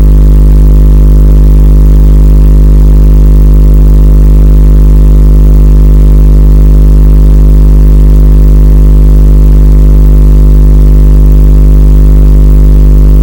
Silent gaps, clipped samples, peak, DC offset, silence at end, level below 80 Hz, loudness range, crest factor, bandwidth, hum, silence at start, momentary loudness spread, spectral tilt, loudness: none; 60%; 0 dBFS; 5%; 0 s; -2 dBFS; 0 LU; 2 dB; 16.5 kHz; 50 Hz at 0 dBFS; 0 s; 0 LU; -9.5 dB/octave; -5 LUFS